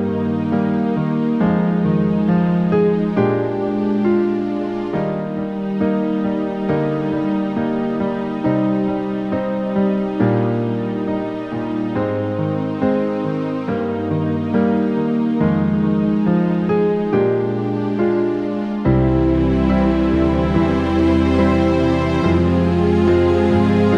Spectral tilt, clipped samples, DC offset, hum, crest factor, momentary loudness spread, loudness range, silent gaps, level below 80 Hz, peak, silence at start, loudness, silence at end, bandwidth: -9 dB/octave; under 0.1%; under 0.1%; none; 14 dB; 6 LU; 4 LU; none; -34 dBFS; -2 dBFS; 0 s; -18 LUFS; 0 s; 7.2 kHz